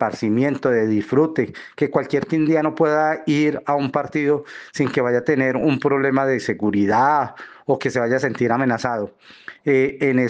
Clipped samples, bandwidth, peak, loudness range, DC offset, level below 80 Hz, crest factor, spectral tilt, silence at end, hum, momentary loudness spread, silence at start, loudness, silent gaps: under 0.1%; 9 kHz; -4 dBFS; 1 LU; under 0.1%; -62 dBFS; 16 dB; -7 dB/octave; 0 s; none; 7 LU; 0 s; -20 LUFS; none